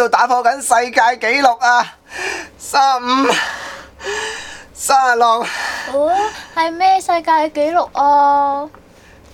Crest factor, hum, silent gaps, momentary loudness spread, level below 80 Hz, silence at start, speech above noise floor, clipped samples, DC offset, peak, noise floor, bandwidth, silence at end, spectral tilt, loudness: 16 dB; none; none; 12 LU; -52 dBFS; 0 s; 29 dB; under 0.1%; under 0.1%; 0 dBFS; -44 dBFS; 17.5 kHz; 0.65 s; -1.5 dB/octave; -15 LUFS